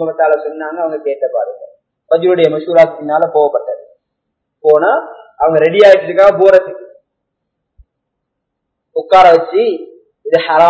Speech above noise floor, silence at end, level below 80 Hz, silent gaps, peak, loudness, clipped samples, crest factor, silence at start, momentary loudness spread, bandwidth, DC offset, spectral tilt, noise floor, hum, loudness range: 63 dB; 0 s; -54 dBFS; none; 0 dBFS; -11 LUFS; 1%; 12 dB; 0 s; 16 LU; 8 kHz; under 0.1%; -6 dB/octave; -74 dBFS; none; 4 LU